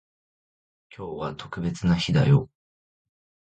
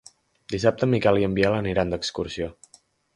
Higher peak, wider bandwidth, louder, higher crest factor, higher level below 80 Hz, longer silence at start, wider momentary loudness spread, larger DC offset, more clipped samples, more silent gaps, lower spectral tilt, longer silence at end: second, -8 dBFS vs -4 dBFS; second, 8.6 kHz vs 11.5 kHz; about the same, -24 LUFS vs -24 LUFS; about the same, 20 dB vs 20 dB; about the same, -48 dBFS vs -46 dBFS; first, 1 s vs 0.5 s; first, 18 LU vs 12 LU; neither; neither; neither; about the same, -7 dB/octave vs -6 dB/octave; first, 1.15 s vs 0.65 s